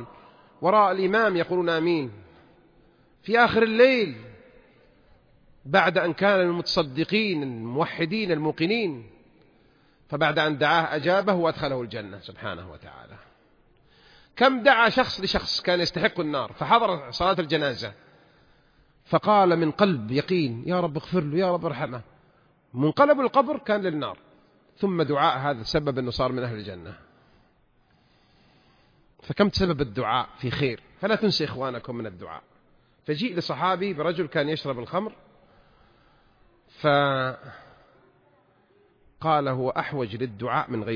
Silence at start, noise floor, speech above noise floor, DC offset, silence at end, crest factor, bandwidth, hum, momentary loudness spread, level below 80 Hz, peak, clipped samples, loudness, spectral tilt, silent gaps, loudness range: 0 s; -63 dBFS; 39 dB; under 0.1%; 0 s; 22 dB; 5.4 kHz; none; 16 LU; -54 dBFS; -4 dBFS; under 0.1%; -24 LUFS; -6.5 dB/octave; none; 6 LU